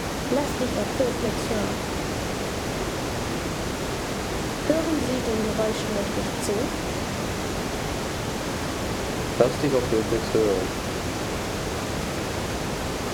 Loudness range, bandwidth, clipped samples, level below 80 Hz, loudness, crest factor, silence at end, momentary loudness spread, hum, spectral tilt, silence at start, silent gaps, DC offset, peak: 3 LU; over 20 kHz; under 0.1%; -40 dBFS; -26 LUFS; 20 dB; 0 s; 6 LU; none; -4.5 dB/octave; 0 s; none; under 0.1%; -6 dBFS